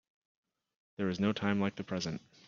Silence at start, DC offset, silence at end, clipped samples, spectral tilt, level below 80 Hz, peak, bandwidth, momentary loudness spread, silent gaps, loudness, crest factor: 1 s; under 0.1%; 0.3 s; under 0.1%; -5.5 dB/octave; -70 dBFS; -16 dBFS; 7.2 kHz; 7 LU; none; -34 LUFS; 22 dB